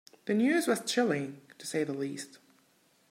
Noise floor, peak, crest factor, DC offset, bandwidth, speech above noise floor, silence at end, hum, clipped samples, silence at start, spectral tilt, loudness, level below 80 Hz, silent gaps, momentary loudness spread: -68 dBFS; -14 dBFS; 18 dB; under 0.1%; 16 kHz; 37 dB; 0.75 s; none; under 0.1%; 0.25 s; -4.5 dB/octave; -30 LUFS; -84 dBFS; none; 16 LU